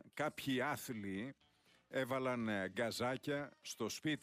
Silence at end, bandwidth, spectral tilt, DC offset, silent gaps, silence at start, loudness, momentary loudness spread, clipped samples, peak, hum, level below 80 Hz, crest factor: 0.05 s; 15.5 kHz; -4.5 dB/octave; under 0.1%; none; 0.05 s; -41 LUFS; 6 LU; under 0.1%; -28 dBFS; none; -78 dBFS; 14 dB